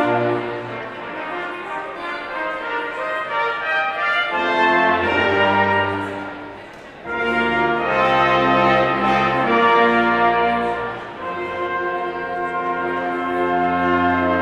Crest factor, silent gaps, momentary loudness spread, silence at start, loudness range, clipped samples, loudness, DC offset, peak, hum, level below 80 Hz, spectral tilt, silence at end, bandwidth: 16 dB; none; 13 LU; 0 s; 7 LU; under 0.1%; -19 LUFS; under 0.1%; -2 dBFS; none; -50 dBFS; -6 dB/octave; 0 s; 10.5 kHz